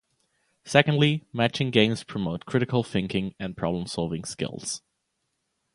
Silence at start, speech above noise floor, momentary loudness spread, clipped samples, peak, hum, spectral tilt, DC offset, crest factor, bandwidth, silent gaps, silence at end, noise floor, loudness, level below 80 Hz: 0.65 s; 52 dB; 11 LU; under 0.1%; 0 dBFS; none; -5 dB/octave; under 0.1%; 26 dB; 11.5 kHz; none; 0.95 s; -77 dBFS; -26 LUFS; -56 dBFS